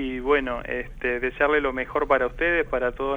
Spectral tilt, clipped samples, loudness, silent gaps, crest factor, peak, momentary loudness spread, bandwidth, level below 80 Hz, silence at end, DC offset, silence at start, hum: -6.5 dB/octave; under 0.1%; -24 LUFS; none; 18 dB; -6 dBFS; 7 LU; 7.2 kHz; -40 dBFS; 0 s; under 0.1%; 0 s; none